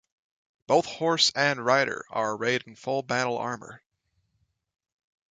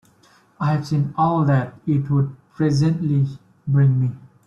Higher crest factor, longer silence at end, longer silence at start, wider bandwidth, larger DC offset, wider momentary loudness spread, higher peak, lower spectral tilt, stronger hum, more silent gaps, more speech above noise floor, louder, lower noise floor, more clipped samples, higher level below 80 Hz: first, 22 dB vs 14 dB; first, 1.55 s vs 0.2 s; about the same, 0.7 s vs 0.6 s; first, 9.6 kHz vs 7.4 kHz; neither; about the same, 10 LU vs 8 LU; about the same, -6 dBFS vs -6 dBFS; second, -3 dB/octave vs -8.5 dB/octave; neither; neither; first, 48 dB vs 36 dB; second, -26 LUFS vs -20 LUFS; first, -74 dBFS vs -55 dBFS; neither; second, -72 dBFS vs -54 dBFS